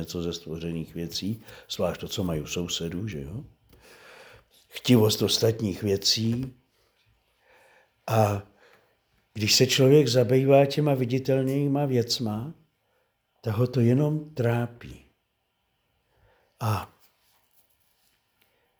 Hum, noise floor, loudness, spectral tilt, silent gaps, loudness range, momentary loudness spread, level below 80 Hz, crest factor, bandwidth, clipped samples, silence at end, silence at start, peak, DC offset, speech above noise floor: none; -75 dBFS; -25 LUFS; -5 dB/octave; none; 11 LU; 17 LU; -56 dBFS; 20 dB; over 20 kHz; under 0.1%; 1.95 s; 0 s; -6 dBFS; under 0.1%; 51 dB